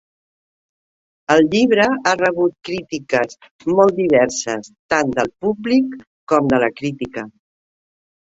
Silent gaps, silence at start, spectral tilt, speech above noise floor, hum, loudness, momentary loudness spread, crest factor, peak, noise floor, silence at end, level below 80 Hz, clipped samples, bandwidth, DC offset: 3.51-3.59 s, 4.79-4.89 s, 6.07-6.27 s; 1.3 s; -4.5 dB/octave; over 73 dB; none; -18 LUFS; 13 LU; 18 dB; 0 dBFS; under -90 dBFS; 1.1 s; -54 dBFS; under 0.1%; 8 kHz; under 0.1%